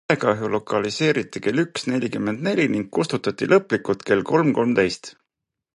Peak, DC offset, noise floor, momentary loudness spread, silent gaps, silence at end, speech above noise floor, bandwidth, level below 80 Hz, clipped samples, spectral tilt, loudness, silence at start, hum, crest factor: -4 dBFS; under 0.1%; -82 dBFS; 6 LU; none; 0.65 s; 61 dB; 11.5 kHz; -58 dBFS; under 0.1%; -5.5 dB/octave; -21 LUFS; 0.1 s; none; 18 dB